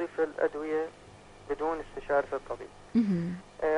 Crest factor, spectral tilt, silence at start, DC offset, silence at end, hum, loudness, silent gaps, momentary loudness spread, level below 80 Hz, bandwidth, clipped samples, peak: 16 dB; -8 dB/octave; 0 s; under 0.1%; 0 s; 50 Hz at -60 dBFS; -32 LUFS; none; 12 LU; -56 dBFS; 10.5 kHz; under 0.1%; -16 dBFS